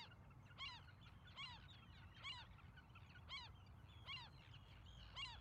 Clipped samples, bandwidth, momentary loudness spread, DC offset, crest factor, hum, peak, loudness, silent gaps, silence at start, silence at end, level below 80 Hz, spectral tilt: under 0.1%; 11 kHz; 10 LU; under 0.1%; 16 dB; none; -42 dBFS; -57 LUFS; none; 0 s; 0 s; -68 dBFS; -3.5 dB/octave